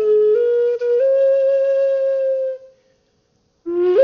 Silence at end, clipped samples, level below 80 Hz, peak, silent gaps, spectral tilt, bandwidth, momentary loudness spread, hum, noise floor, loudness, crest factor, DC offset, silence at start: 0 s; under 0.1%; -68 dBFS; -4 dBFS; none; -4 dB/octave; 5.8 kHz; 11 LU; none; -63 dBFS; -17 LUFS; 12 dB; under 0.1%; 0 s